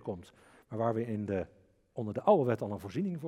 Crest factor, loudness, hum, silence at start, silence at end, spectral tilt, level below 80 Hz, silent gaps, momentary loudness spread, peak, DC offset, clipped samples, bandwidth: 22 dB; -33 LUFS; none; 0 s; 0 s; -8.5 dB/octave; -72 dBFS; none; 18 LU; -12 dBFS; under 0.1%; under 0.1%; 14 kHz